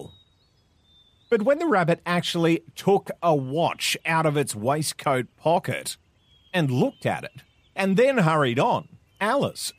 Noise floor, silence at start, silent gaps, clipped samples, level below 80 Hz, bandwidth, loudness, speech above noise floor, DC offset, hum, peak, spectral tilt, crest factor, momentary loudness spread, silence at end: -63 dBFS; 0 s; none; under 0.1%; -66 dBFS; 15.5 kHz; -24 LUFS; 40 dB; under 0.1%; none; -8 dBFS; -5 dB/octave; 16 dB; 8 LU; 0.05 s